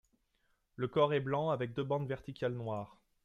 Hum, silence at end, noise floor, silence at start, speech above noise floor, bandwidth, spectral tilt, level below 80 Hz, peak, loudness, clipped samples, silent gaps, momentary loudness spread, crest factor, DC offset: none; 0.35 s; -77 dBFS; 0.8 s; 42 dB; 7.4 kHz; -8 dB/octave; -68 dBFS; -16 dBFS; -36 LUFS; under 0.1%; none; 10 LU; 20 dB; under 0.1%